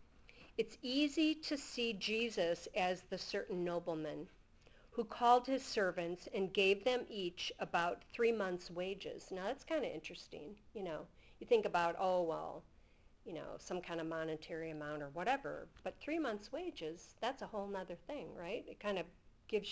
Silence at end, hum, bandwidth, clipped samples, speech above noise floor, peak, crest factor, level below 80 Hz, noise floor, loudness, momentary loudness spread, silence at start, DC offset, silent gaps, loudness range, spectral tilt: 0 s; none; 8 kHz; under 0.1%; 26 dB; -18 dBFS; 22 dB; -68 dBFS; -65 dBFS; -40 LUFS; 14 LU; 0 s; under 0.1%; none; 7 LU; -4.5 dB/octave